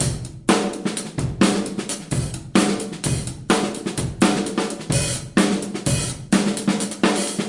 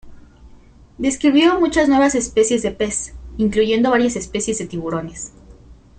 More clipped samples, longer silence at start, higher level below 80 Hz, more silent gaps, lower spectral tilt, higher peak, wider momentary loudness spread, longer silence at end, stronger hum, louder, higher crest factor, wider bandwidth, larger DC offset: neither; about the same, 0 s vs 0.05 s; about the same, -42 dBFS vs -42 dBFS; neither; about the same, -4.5 dB/octave vs -4 dB/octave; about the same, -2 dBFS vs -2 dBFS; second, 7 LU vs 12 LU; second, 0 s vs 0.25 s; neither; second, -22 LUFS vs -18 LUFS; about the same, 20 dB vs 16 dB; first, 11.5 kHz vs 9.4 kHz; neither